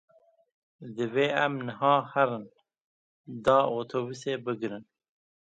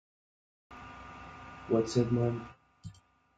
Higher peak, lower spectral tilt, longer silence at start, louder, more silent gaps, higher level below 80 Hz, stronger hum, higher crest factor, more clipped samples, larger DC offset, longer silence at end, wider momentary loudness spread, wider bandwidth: first, -8 dBFS vs -14 dBFS; about the same, -6 dB/octave vs -7 dB/octave; about the same, 0.8 s vs 0.7 s; first, -28 LUFS vs -31 LUFS; first, 2.81-3.24 s vs none; second, -68 dBFS vs -60 dBFS; neither; about the same, 22 dB vs 22 dB; neither; neither; first, 0.75 s vs 0.45 s; second, 16 LU vs 23 LU; about the same, 9.2 kHz vs 9.2 kHz